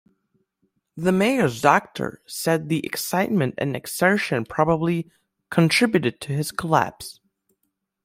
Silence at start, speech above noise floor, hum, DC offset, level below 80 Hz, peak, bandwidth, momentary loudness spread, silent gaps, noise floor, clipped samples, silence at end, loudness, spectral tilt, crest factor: 0.95 s; 54 dB; none; under 0.1%; -58 dBFS; -2 dBFS; 16 kHz; 10 LU; none; -76 dBFS; under 0.1%; 0.9 s; -22 LUFS; -5 dB/octave; 20 dB